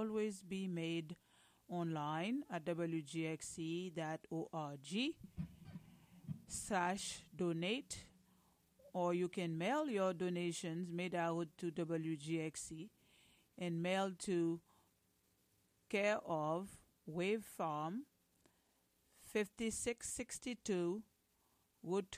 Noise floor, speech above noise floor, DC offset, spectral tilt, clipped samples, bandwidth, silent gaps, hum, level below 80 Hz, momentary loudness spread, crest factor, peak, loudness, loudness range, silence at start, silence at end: -79 dBFS; 37 dB; under 0.1%; -5 dB/octave; under 0.1%; 15.5 kHz; none; none; -74 dBFS; 12 LU; 18 dB; -26 dBFS; -42 LUFS; 4 LU; 0 s; 0 s